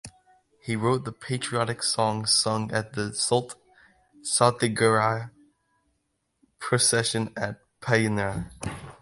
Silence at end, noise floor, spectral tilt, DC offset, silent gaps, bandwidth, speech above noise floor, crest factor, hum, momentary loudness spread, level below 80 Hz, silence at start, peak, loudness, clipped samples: 0.1 s; -76 dBFS; -3.5 dB/octave; under 0.1%; none; 11.5 kHz; 50 dB; 24 dB; none; 15 LU; -56 dBFS; 0.05 s; -4 dBFS; -25 LUFS; under 0.1%